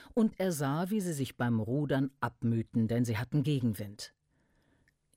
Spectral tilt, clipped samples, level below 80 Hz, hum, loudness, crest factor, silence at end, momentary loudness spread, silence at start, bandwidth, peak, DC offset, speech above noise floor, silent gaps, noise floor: -6.5 dB/octave; under 0.1%; -64 dBFS; none; -32 LUFS; 14 dB; 1.1 s; 5 LU; 0 s; 16 kHz; -18 dBFS; under 0.1%; 41 dB; none; -72 dBFS